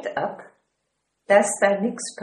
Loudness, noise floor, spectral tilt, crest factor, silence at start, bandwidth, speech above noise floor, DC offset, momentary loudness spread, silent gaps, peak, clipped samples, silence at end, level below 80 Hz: -21 LUFS; -76 dBFS; -3.5 dB/octave; 22 dB; 0 s; 12.5 kHz; 54 dB; under 0.1%; 13 LU; none; -2 dBFS; under 0.1%; 0 s; -72 dBFS